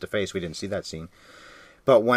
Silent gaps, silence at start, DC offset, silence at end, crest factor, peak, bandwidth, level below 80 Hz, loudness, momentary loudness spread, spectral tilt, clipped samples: none; 0 s; under 0.1%; 0 s; 20 dB; -6 dBFS; 15 kHz; -60 dBFS; -27 LUFS; 26 LU; -5 dB/octave; under 0.1%